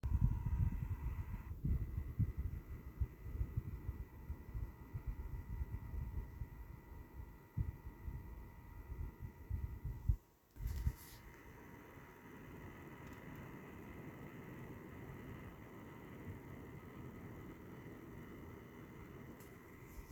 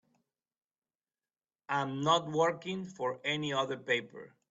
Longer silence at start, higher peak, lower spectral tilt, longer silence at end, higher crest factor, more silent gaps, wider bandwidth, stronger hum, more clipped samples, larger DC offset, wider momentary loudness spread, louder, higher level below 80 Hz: second, 0.05 s vs 1.7 s; second, -20 dBFS vs -14 dBFS; first, -8 dB/octave vs -4.5 dB/octave; second, 0 s vs 0.25 s; about the same, 24 dB vs 20 dB; neither; first, over 20 kHz vs 8 kHz; neither; neither; neither; first, 15 LU vs 10 LU; second, -48 LUFS vs -33 LUFS; first, -48 dBFS vs -78 dBFS